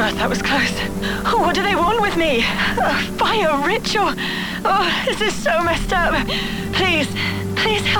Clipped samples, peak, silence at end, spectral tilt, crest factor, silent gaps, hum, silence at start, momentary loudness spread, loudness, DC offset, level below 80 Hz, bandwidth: under 0.1%; -4 dBFS; 0 s; -4 dB/octave; 14 dB; none; none; 0 s; 5 LU; -18 LUFS; under 0.1%; -34 dBFS; 19.5 kHz